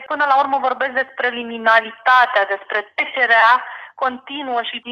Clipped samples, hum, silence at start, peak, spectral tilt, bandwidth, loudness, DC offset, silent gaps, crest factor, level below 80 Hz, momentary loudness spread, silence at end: under 0.1%; none; 0 s; -2 dBFS; -3 dB/octave; 15 kHz; -17 LUFS; under 0.1%; none; 16 dB; -70 dBFS; 11 LU; 0 s